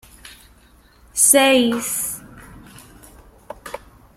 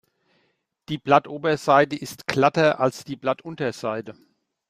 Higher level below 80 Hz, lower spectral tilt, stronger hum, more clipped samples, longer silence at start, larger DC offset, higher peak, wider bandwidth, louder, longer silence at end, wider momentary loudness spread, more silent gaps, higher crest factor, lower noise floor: first, -52 dBFS vs -64 dBFS; second, -1 dB/octave vs -5.5 dB/octave; neither; neither; second, 0.25 s vs 0.9 s; neither; about the same, 0 dBFS vs -2 dBFS; about the same, 16.5 kHz vs 15.5 kHz; first, -15 LUFS vs -22 LUFS; second, 0.4 s vs 0.6 s; first, 24 LU vs 12 LU; neither; about the same, 22 dB vs 20 dB; second, -51 dBFS vs -70 dBFS